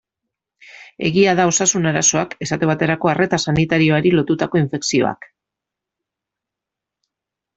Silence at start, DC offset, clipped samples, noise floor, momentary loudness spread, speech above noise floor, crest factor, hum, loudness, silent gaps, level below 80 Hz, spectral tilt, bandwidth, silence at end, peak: 0.75 s; under 0.1%; under 0.1%; -85 dBFS; 7 LU; 68 dB; 18 dB; none; -17 LUFS; none; -52 dBFS; -4 dB/octave; 8.2 kHz; 2.4 s; -2 dBFS